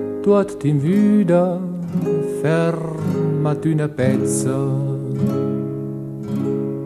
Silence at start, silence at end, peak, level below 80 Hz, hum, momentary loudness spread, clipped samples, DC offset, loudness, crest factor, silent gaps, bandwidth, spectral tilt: 0 s; 0 s; -4 dBFS; -56 dBFS; none; 9 LU; under 0.1%; under 0.1%; -19 LUFS; 14 dB; none; 13.5 kHz; -7.5 dB/octave